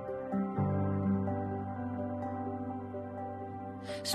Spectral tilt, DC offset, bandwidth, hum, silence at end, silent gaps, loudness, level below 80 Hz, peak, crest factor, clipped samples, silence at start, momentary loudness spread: -6 dB/octave; under 0.1%; 13 kHz; none; 0 s; none; -36 LUFS; -66 dBFS; -22 dBFS; 14 dB; under 0.1%; 0 s; 9 LU